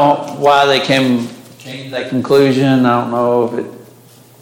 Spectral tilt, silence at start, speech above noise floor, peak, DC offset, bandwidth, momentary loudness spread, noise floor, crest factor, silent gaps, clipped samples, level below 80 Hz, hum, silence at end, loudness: -6 dB/octave; 0 s; 30 dB; 0 dBFS; under 0.1%; 17 kHz; 17 LU; -43 dBFS; 14 dB; none; under 0.1%; -60 dBFS; none; 0.6 s; -13 LUFS